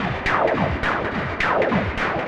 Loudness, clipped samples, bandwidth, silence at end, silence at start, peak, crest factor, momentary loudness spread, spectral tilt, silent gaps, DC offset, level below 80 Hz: -21 LUFS; under 0.1%; 11 kHz; 0 s; 0 s; -6 dBFS; 16 dB; 4 LU; -6.5 dB/octave; none; under 0.1%; -36 dBFS